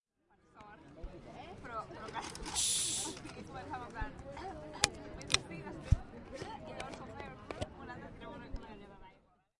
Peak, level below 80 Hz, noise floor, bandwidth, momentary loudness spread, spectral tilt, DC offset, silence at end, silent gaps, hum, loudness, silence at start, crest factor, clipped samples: -6 dBFS; -48 dBFS; -72 dBFS; 11.5 kHz; 19 LU; -2.5 dB/octave; under 0.1%; 0.4 s; none; none; -39 LUFS; 0.55 s; 36 dB; under 0.1%